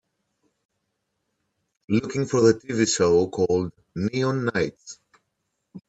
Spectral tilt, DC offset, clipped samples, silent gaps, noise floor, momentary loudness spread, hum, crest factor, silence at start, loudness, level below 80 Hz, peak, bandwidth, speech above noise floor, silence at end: -5 dB/octave; under 0.1%; under 0.1%; none; -77 dBFS; 10 LU; none; 20 dB; 1.9 s; -23 LUFS; -60 dBFS; -4 dBFS; 8.8 kHz; 55 dB; 0.1 s